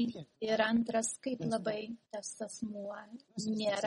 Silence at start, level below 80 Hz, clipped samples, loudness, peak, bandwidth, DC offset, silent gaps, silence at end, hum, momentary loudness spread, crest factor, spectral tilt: 0 s; -74 dBFS; under 0.1%; -36 LUFS; -16 dBFS; 11.5 kHz; under 0.1%; none; 0 s; none; 13 LU; 20 dB; -4 dB/octave